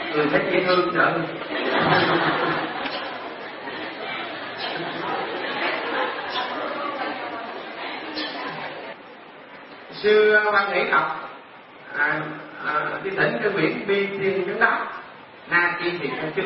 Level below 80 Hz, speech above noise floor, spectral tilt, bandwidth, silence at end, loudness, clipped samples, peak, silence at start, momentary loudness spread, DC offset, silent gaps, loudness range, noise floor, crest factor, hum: -64 dBFS; 23 dB; -9 dB/octave; 5.8 kHz; 0 s; -23 LUFS; under 0.1%; -4 dBFS; 0 s; 15 LU; under 0.1%; none; 7 LU; -44 dBFS; 20 dB; none